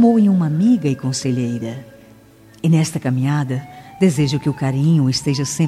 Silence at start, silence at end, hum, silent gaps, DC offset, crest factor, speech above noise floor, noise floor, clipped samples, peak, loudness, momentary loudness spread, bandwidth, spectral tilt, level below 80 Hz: 0 s; 0 s; none; none; under 0.1%; 14 dB; 29 dB; -46 dBFS; under 0.1%; -4 dBFS; -18 LUFS; 10 LU; 14 kHz; -6.5 dB/octave; -54 dBFS